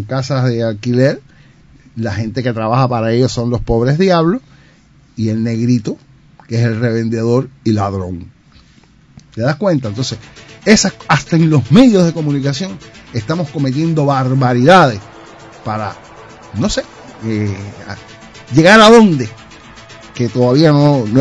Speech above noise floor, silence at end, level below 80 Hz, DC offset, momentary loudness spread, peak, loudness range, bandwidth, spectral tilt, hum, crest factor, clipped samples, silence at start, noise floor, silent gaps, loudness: 34 dB; 0 s; -40 dBFS; under 0.1%; 19 LU; 0 dBFS; 7 LU; 11 kHz; -6 dB/octave; none; 14 dB; 0.7%; 0 s; -47 dBFS; none; -13 LUFS